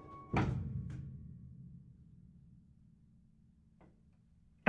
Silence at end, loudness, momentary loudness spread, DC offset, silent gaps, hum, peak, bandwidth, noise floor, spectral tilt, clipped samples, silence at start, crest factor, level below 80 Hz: 0 s; -41 LUFS; 26 LU; under 0.1%; none; none; -12 dBFS; 8.2 kHz; -67 dBFS; -8 dB/octave; under 0.1%; 0 s; 30 dB; -56 dBFS